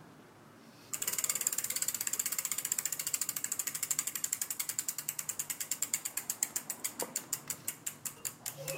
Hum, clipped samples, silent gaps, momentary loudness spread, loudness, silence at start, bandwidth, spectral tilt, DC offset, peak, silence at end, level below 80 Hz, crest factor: none; under 0.1%; none; 7 LU; -34 LUFS; 0 s; 17 kHz; 0 dB/octave; under 0.1%; -12 dBFS; 0 s; -78 dBFS; 26 dB